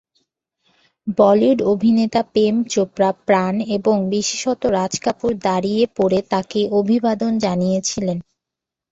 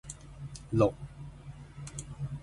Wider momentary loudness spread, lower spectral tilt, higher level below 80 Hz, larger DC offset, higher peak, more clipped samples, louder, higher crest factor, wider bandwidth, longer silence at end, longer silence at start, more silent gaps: second, 6 LU vs 19 LU; second, -5.5 dB/octave vs -7 dB/octave; about the same, -54 dBFS vs -52 dBFS; neither; first, -2 dBFS vs -12 dBFS; neither; first, -18 LUFS vs -32 LUFS; second, 16 dB vs 24 dB; second, 8 kHz vs 11.5 kHz; first, 0.7 s vs 0 s; first, 1.05 s vs 0.05 s; neither